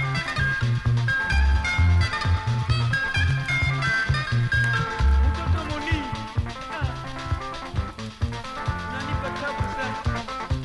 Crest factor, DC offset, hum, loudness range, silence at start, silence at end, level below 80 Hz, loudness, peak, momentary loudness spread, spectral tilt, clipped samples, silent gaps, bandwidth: 14 dB; under 0.1%; none; 7 LU; 0 s; 0 s; -30 dBFS; -25 LUFS; -10 dBFS; 9 LU; -5.5 dB/octave; under 0.1%; none; 11.5 kHz